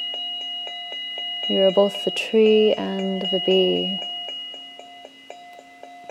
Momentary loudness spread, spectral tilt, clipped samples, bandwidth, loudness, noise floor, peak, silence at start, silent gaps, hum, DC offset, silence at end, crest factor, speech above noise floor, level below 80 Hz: 24 LU; -5 dB/octave; under 0.1%; 13 kHz; -21 LUFS; -44 dBFS; -6 dBFS; 0 s; none; none; under 0.1%; 0 s; 18 dB; 24 dB; -74 dBFS